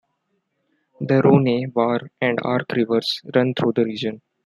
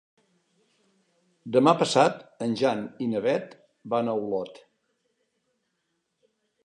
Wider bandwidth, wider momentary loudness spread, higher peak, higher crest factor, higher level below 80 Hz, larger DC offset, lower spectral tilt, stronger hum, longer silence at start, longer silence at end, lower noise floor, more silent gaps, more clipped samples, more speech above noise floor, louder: first, 12.5 kHz vs 11 kHz; second, 8 LU vs 12 LU; first, -2 dBFS vs -6 dBFS; about the same, 18 dB vs 22 dB; first, -66 dBFS vs -76 dBFS; neither; first, -7.5 dB/octave vs -5 dB/octave; neither; second, 1 s vs 1.45 s; second, 0.3 s vs 2.15 s; second, -72 dBFS vs -77 dBFS; neither; neither; about the same, 52 dB vs 53 dB; first, -20 LUFS vs -25 LUFS